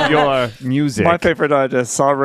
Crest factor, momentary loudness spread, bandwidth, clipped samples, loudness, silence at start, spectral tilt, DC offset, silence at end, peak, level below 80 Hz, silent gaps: 14 dB; 5 LU; 14.5 kHz; under 0.1%; -16 LUFS; 0 s; -5 dB/octave; under 0.1%; 0 s; 0 dBFS; -46 dBFS; none